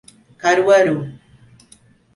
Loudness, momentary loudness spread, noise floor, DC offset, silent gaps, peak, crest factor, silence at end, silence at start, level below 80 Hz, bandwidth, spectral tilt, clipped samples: -16 LUFS; 13 LU; -51 dBFS; under 0.1%; none; -2 dBFS; 16 dB; 1.05 s; 0.45 s; -60 dBFS; 11.5 kHz; -5 dB/octave; under 0.1%